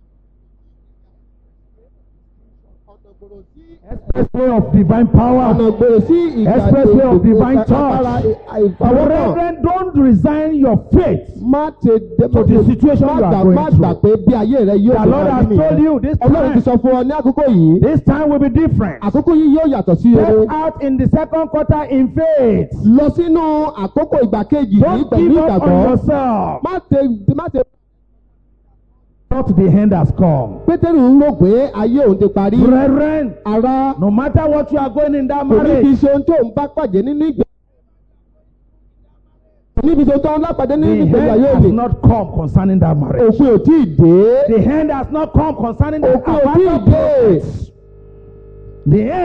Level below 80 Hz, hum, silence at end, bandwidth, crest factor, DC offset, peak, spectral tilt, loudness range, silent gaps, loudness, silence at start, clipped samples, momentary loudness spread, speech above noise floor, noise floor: -30 dBFS; none; 0 s; 5.8 kHz; 12 dB; under 0.1%; 0 dBFS; -11 dB/octave; 5 LU; none; -12 LUFS; 3.9 s; under 0.1%; 7 LU; 42 dB; -53 dBFS